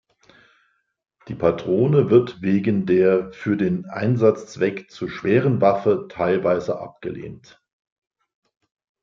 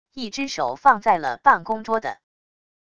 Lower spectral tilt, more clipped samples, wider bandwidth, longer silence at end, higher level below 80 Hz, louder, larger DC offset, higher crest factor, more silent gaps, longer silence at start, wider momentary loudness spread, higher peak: first, -8.5 dB/octave vs -3.5 dB/octave; neither; second, 7.4 kHz vs 9.6 kHz; first, 1.65 s vs 0.8 s; about the same, -58 dBFS vs -60 dBFS; about the same, -20 LUFS vs -21 LUFS; second, under 0.1% vs 0.4%; about the same, 18 dB vs 20 dB; neither; first, 1.25 s vs 0.15 s; first, 14 LU vs 10 LU; about the same, -4 dBFS vs -2 dBFS